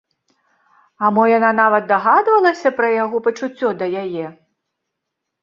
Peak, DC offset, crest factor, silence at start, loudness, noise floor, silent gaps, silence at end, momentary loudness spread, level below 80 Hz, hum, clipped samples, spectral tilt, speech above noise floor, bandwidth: -2 dBFS; under 0.1%; 16 dB; 1 s; -16 LUFS; -78 dBFS; none; 1.1 s; 10 LU; -68 dBFS; none; under 0.1%; -6 dB/octave; 63 dB; 7.4 kHz